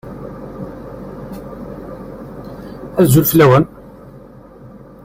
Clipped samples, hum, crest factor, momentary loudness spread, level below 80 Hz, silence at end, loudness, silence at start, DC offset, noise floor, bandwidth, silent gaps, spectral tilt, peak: under 0.1%; none; 18 dB; 22 LU; -42 dBFS; 1.4 s; -12 LUFS; 0.05 s; under 0.1%; -39 dBFS; 16 kHz; none; -6.5 dB/octave; 0 dBFS